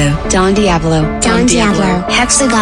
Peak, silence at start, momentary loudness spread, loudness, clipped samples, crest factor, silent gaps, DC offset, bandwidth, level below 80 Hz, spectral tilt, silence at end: -2 dBFS; 0 s; 3 LU; -11 LUFS; under 0.1%; 10 dB; none; under 0.1%; 13.5 kHz; -24 dBFS; -4 dB/octave; 0 s